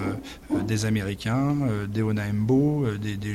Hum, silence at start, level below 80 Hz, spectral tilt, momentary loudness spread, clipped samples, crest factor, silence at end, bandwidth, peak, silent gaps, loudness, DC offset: none; 0 s; -48 dBFS; -7 dB/octave; 8 LU; under 0.1%; 14 dB; 0 s; 14.5 kHz; -12 dBFS; none; -25 LUFS; under 0.1%